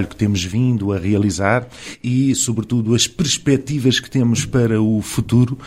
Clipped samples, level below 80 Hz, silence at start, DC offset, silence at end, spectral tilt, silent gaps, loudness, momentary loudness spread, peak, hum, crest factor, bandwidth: under 0.1%; -42 dBFS; 0 s; under 0.1%; 0 s; -5 dB/octave; none; -18 LUFS; 4 LU; -2 dBFS; none; 16 dB; 15.5 kHz